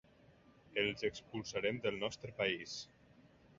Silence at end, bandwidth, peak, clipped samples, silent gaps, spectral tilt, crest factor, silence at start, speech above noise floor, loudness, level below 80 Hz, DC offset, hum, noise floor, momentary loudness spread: 0.3 s; 7.4 kHz; -20 dBFS; under 0.1%; none; -2.5 dB/octave; 22 dB; 0.65 s; 26 dB; -39 LUFS; -70 dBFS; under 0.1%; none; -65 dBFS; 9 LU